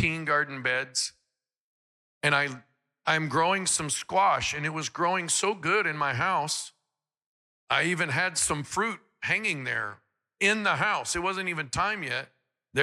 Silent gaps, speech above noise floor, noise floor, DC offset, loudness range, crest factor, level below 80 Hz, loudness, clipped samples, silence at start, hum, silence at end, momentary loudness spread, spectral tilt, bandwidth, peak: 1.57-2.21 s, 7.26-7.67 s; 57 dB; -84 dBFS; under 0.1%; 3 LU; 20 dB; -60 dBFS; -27 LUFS; under 0.1%; 0 s; none; 0 s; 8 LU; -2.5 dB/octave; 15.5 kHz; -10 dBFS